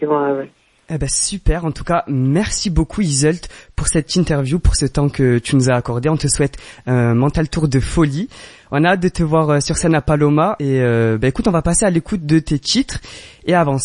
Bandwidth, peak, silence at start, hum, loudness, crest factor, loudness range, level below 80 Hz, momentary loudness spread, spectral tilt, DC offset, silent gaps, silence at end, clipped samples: 11.5 kHz; 0 dBFS; 0 s; none; -16 LUFS; 16 dB; 2 LU; -28 dBFS; 8 LU; -5 dB/octave; under 0.1%; none; 0 s; under 0.1%